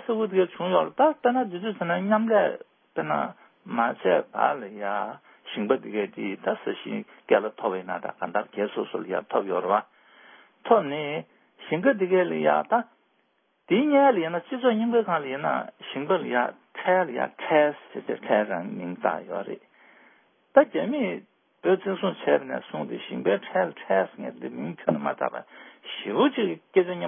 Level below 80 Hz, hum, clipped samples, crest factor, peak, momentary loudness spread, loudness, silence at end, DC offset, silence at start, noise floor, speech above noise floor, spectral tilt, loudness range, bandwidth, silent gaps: -82 dBFS; none; under 0.1%; 24 dB; -2 dBFS; 12 LU; -26 LUFS; 0 s; under 0.1%; 0 s; -70 dBFS; 44 dB; -10 dB/octave; 4 LU; 3.7 kHz; none